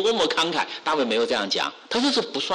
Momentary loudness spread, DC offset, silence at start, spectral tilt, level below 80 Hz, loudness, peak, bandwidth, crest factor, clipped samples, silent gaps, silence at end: 4 LU; under 0.1%; 0 s; -2.5 dB/octave; -64 dBFS; -23 LUFS; -12 dBFS; 12 kHz; 10 dB; under 0.1%; none; 0 s